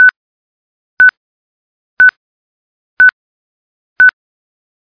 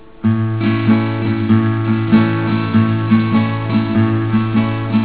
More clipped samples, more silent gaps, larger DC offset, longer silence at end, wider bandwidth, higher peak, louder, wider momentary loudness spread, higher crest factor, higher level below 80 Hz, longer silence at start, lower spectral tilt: neither; first, 0.16-0.97 s, 1.17-1.97 s, 2.17-2.97 s, 3.13-3.96 s vs none; second, under 0.1% vs 1%; first, 0.9 s vs 0 s; first, 5.2 kHz vs 4 kHz; about the same, 0 dBFS vs 0 dBFS; first, -9 LUFS vs -15 LUFS; second, 0 LU vs 4 LU; about the same, 14 dB vs 14 dB; second, -60 dBFS vs -44 dBFS; second, 0 s vs 0.25 s; second, -2.5 dB/octave vs -12 dB/octave